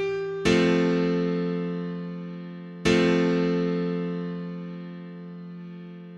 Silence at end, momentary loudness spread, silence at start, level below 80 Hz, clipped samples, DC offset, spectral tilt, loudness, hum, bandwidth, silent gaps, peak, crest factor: 0 s; 19 LU; 0 s; -54 dBFS; under 0.1%; under 0.1%; -6.5 dB/octave; -25 LUFS; none; 9.8 kHz; none; -6 dBFS; 20 dB